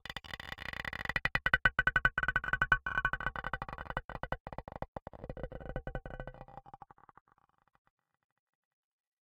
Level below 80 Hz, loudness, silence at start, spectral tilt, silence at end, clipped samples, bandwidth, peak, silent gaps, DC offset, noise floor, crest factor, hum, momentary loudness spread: -50 dBFS; -34 LUFS; 0.05 s; -4.5 dB/octave; 2.5 s; under 0.1%; 16.5 kHz; -12 dBFS; 4.05-4.09 s, 4.40-4.45 s, 4.88-4.93 s, 5.02-5.06 s; under 0.1%; -56 dBFS; 26 dB; none; 19 LU